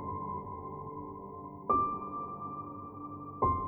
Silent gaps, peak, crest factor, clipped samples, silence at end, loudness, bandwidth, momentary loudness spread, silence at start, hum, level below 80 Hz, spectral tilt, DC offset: none; -16 dBFS; 20 dB; under 0.1%; 0 s; -37 LUFS; 19 kHz; 14 LU; 0 s; none; -56 dBFS; -12.5 dB/octave; under 0.1%